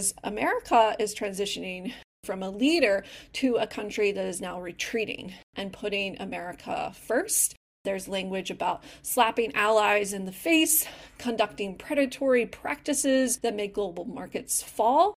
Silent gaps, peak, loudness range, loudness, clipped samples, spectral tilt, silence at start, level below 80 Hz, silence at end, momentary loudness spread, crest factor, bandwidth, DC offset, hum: 2.04-2.23 s, 5.43-5.53 s, 7.57-7.84 s; -8 dBFS; 5 LU; -27 LUFS; under 0.1%; -2.5 dB/octave; 0 s; -60 dBFS; 0.05 s; 13 LU; 20 dB; 16 kHz; under 0.1%; none